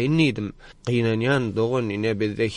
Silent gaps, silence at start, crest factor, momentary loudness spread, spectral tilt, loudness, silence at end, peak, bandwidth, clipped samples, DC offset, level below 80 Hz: none; 0 s; 16 dB; 10 LU; -7 dB/octave; -23 LUFS; 0 s; -8 dBFS; 10.5 kHz; under 0.1%; under 0.1%; -50 dBFS